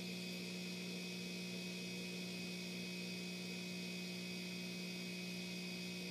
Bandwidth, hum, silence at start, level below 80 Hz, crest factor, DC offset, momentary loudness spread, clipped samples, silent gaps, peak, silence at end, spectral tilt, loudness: 15.5 kHz; 60 Hz at -50 dBFS; 0 s; -84 dBFS; 12 dB; under 0.1%; 0 LU; under 0.1%; none; -34 dBFS; 0 s; -4 dB/octave; -45 LUFS